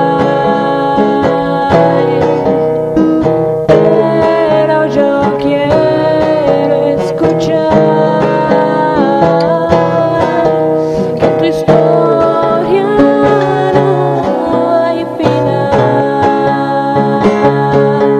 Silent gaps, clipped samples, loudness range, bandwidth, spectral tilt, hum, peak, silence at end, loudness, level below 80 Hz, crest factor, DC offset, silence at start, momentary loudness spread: none; 0.3%; 1 LU; 10.5 kHz; -7.5 dB/octave; none; 0 dBFS; 0 s; -10 LUFS; -40 dBFS; 10 dB; under 0.1%; 0 s; 3 LU